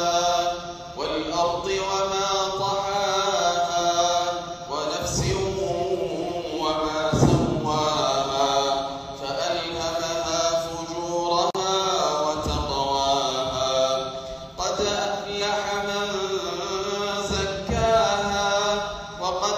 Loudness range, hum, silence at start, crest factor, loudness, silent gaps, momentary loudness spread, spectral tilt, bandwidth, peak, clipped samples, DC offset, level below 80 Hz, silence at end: 2 LU; none; 0 s; 20 dB; -24 LUFS; none; 7 LU; -3.5 dB/octave; 15.5 kHz; -4 dBFS; under 0.1%; under 0.1%; -44 dBFS; 0 s